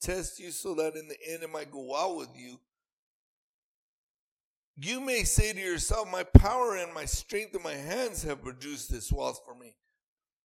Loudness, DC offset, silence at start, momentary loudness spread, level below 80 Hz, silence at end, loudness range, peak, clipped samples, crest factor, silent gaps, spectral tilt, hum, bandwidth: -30 LUFS; under 0.1%; 0 s; 16 LU; -34 dBFS; 0.75 s; 13 LU; 0 dBFS; under 0.1%; 30 dB; 2.92-4.74 s; -5 dB/octave; none; 16.5 kHz